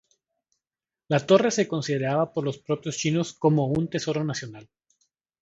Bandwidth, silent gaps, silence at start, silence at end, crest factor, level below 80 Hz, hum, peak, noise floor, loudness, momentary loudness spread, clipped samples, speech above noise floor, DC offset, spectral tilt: 8 kHz; none; 1.1 s; 0.8 s; 22 dB; -62 dBFS; none; -4 dBFS; under -90 dBFS; -25 LUFS; 10 LU; under 0.1%; over 66 dB; under 0.1%; -5.5 dB/octave